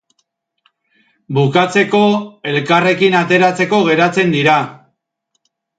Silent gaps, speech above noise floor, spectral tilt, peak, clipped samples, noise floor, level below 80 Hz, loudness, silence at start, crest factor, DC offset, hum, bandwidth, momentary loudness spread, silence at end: none; 57 dB; -6 dB/octave; 0 dBFS; under 0.1%; -70 dBFS; -62 dBFS; -13 LUFS; 1.3 s; 14 dB; under 0.1%; none; 9.2 kHz; 8 LU; 1.05 s